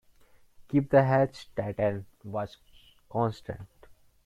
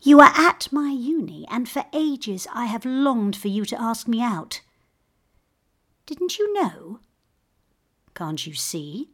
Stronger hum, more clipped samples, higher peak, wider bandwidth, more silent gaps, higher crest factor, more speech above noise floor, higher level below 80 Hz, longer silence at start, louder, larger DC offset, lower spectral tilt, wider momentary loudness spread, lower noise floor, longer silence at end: neither; neither; second, -8 dBFS vs 0 dBFS; second, 11.5 kHz vs 16.5 kHz; neither; about the same, 22 dB vs 22 dB; second, 31 dB vs 49 dB; first, -58 dBFS vs -64 dBFS; first, 0.6 s vs 0.05 s; second, -28 LUFS vs -22 LUFS; neither; first, -8.5 dB/octave vs -4 dB/octave; first, 18 LU vs 13 LU; second, -58 dBFS vs -70 dBFS; first, 0.6 s vs 0.1 s